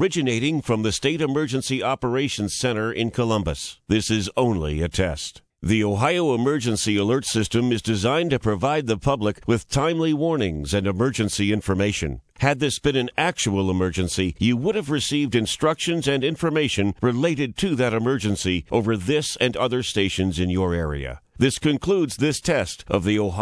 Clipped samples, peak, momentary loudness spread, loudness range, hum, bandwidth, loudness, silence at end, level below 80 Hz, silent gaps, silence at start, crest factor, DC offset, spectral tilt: under 0.1%; -2 dBFS; 3 LU; 2 LU; none; 11 kHz; -22 LUFS; 0 s; -42 dBFS; none; 0 s; 20 dB; under 0.1%; -5 dB/octave